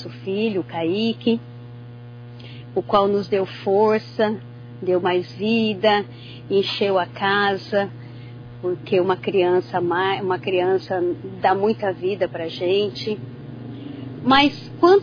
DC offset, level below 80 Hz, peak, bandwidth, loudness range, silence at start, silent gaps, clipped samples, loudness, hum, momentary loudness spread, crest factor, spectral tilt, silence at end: under 0.1%; -56 dBFS; -4 dBFS; 5.2 kHz; 3 LU; 0 s; none; under 0.1%; -21 LUFS; none; 19 LU; 18 dB; -7 dB/octave; 0 s